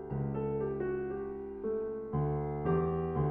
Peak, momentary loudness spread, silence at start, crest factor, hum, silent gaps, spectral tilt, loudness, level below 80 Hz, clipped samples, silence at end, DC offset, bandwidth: -20 dBFS; 7 LU; 0 s; 14 dB; none; none; -10 dB/octave; -35 LUFS; -50 dBFS; under 0.1%; 0 s; under 0.1%; 3.3 kHz